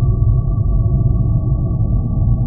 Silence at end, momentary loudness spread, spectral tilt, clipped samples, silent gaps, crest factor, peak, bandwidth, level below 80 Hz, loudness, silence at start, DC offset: 0 s; 2 LU; -20 dB/octave; under 0.1%; none; 12 dB; -2 dBFS; 1.3 kHz; -18 dBFS; -17 LUFS; 0 s; under 0.1%